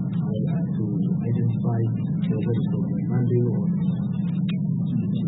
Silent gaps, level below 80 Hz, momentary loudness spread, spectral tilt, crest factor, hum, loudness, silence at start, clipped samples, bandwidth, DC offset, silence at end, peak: none; -56 dBFS; 3 LU; -13.5 dB/octave; 12 dB; none; -24 LUFS; 0 s; under 0.1%; 4 kHz; under 0.1%; 0 s; -10 dBFS